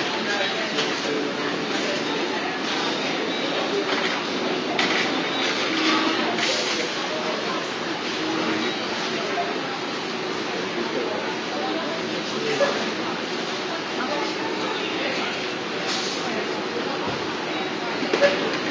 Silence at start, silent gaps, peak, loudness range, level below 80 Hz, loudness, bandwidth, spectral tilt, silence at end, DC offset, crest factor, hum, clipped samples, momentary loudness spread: 0 s; none; -4 dBFS; 4 LU; -66 dBFS; -24 LUFS; 8 kHz; -3 dB/octave; 0 s; under 0.1%; 20 dB; none; under 0.1%; 6 LU